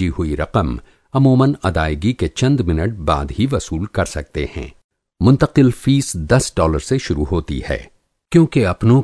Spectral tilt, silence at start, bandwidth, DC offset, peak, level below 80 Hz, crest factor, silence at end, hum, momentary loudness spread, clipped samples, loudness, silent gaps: -6.5 dB/octave; 0 s; 11 kHz; under 0.1%; 0 dBFS; -30 dBFS; 16 dB; 0 s; none; 11 LU; under 0.1%; -17 LUFS; 4.84-4.89 s